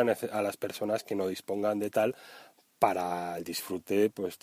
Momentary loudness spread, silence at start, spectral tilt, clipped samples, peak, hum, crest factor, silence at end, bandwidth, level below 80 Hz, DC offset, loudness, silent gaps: 7 LU; 0 s; -5 dB/octave; under 0.1%; -8 dBFS; none; 24 dB; 0.05 s; 16 kHz; -74 dBFS; under 0.1%; -31 LUFS; none